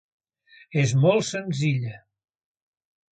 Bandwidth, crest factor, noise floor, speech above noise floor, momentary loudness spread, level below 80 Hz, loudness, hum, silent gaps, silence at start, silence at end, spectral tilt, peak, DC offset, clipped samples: 9.2 kHz; 18 dB; -55 dBFS; 33 dB; 10 LU; -62 dBFS; -23 LUFS; none; none; 0.7 s; 1.15 s; -6 dB/octave; -8 dBFS; under 0.1%; under 0.1%